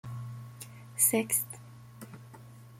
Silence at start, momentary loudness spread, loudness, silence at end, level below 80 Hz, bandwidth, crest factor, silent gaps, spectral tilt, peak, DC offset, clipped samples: 0.05 s; 25 LU; -27 LUFS; 0 s; -70 dBFS; 16.5 kHz; 24 dB; none; -3.5 dB/octave; -10 dBFS; under 0.1%; under 0.1%